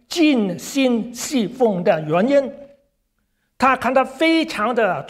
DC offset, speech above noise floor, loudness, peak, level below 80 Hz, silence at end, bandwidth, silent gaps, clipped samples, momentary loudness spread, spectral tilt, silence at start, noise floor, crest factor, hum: under 0.1%; 51 dB; -18 LUFS; -2 dBFS; -58 dBFS; 0 s; 15.5 kHz; none; under 0.1%; 6 LU; -4.5 dB/octave; 0.1 s; -69 dBFS; 16 dB; none